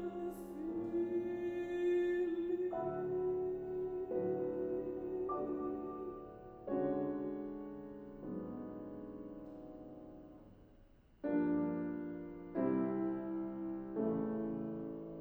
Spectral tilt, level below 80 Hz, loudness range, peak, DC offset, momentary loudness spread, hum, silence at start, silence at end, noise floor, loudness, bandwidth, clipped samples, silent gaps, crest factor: -9 dB/octave; -66 dBFS; 9 LU; -24 dBFS; under 0.1%; 15 LU; none; 0 s; 0 s; -63 dBFS; -40 LUFS; 11 kHz; under 0.1%; none; 16 dB